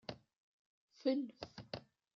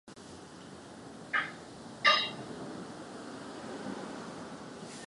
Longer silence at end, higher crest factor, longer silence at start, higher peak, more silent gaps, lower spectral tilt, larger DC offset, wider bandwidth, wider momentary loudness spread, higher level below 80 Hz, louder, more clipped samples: first, 0.35 s vs 0 s; second, 20 dB vs 28 dB; about the same, 0.1 s vs 0.05 s; second, -24 dBFS vs -10 dBFS; first, 0.36-0.88 s vs none; first, -4.5 dB/octave vs -3 dB/octave; neither; second, 7 kHz vs 11.5 kHz; second, 14 LU vs 22 LU; second, -76 dBFS vs -70 dBFS; second, -43 LUFS vs -34 LUFS; neither